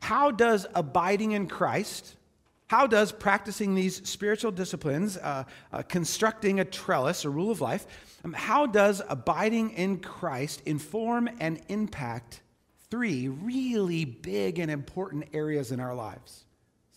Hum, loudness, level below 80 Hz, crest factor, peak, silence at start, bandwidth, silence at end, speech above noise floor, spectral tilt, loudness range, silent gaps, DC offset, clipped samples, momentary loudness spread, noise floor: none; -28 LUFS; -62 dBFS; 22 dB; -8 dBFS; 0 s; 16 kHz; 0.6 s; 39 dB; -5 dB/octave; 5 LU; none; under 0.1%; under 0.1%; 12 LU; -68 dBFS